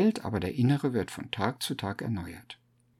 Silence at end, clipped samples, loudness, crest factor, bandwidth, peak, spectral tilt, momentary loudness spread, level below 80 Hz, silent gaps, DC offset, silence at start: 0.45 s; under 0.1%; -31 LUFS; 18 dB; 16 kHz; -12 dBFS; -6 dB/octave; 18 LU; -60 dBFS; none; under 0.1%; 0 s